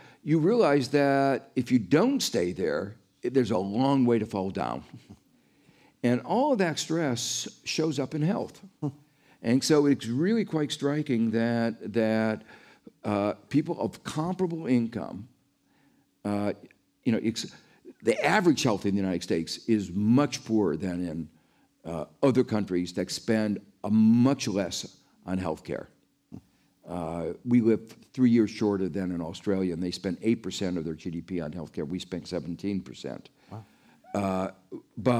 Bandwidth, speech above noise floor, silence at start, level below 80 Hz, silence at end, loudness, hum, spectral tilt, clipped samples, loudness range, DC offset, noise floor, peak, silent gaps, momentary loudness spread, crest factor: 15 kHz; 40 dB; 0.25 s; -64 dBFS; 0 s; -28 LUFS; none; -5.5 dB/octave; under 0.1%; 6 LU; under 0.1%; -67 dBFS; -10 dBFS; none; 14 LU; 18 dB